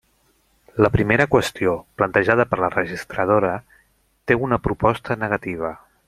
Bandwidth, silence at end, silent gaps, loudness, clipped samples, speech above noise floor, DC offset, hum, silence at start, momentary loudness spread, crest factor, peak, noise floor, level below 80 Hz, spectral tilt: 15 kHz; 0.3 s; none; -20 LUFS; under 0.1%; 43 dB; under 0.1%; none; 0.75 s; 11 LU; 20 dB; -2 dBFS; -62 dBFS; -44 dBFS; -6.5 dB/octave